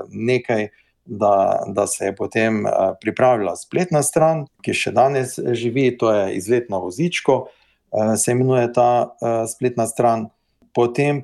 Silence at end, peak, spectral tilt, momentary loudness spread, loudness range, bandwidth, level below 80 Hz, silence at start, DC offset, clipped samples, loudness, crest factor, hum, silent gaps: 0 s; -4 dBFS; -5 dB/octave; 7 LU; 1 LU; 12.5 kHz; -62 dBFS; 0 s; under 0.1%; under 0.1%; -19 LUFS; 16 dB; none; none